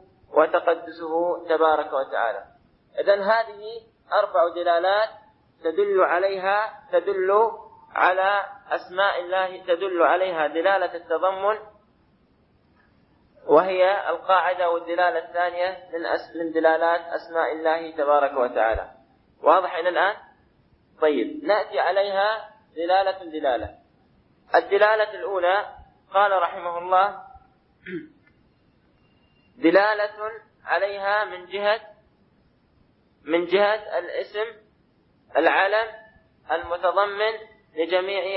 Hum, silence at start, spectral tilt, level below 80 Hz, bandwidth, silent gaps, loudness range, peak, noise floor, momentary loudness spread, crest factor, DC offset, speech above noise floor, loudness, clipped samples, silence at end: none; 0.3 s; -8 dB/octave; -56 dBFS; 5.8 kHz; none; 4 LU; -2 dBFS; -62 dBFS; 11 LU; 20 dB; under 0.1%; 39 dB; -23 LUFS; under 0.1%; 0 s